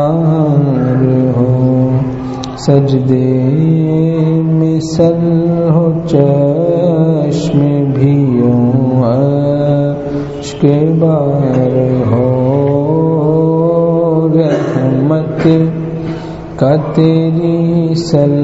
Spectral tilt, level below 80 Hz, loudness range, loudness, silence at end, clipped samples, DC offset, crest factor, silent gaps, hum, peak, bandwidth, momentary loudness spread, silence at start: -9 dB/octave; -40 dBFS; 1 LU; -11 LUFS; 0 s; under 0.1%; under 0.1%; 10 dB; none; none; 0 dBFS; 8 kHz; 4 LU; 0 s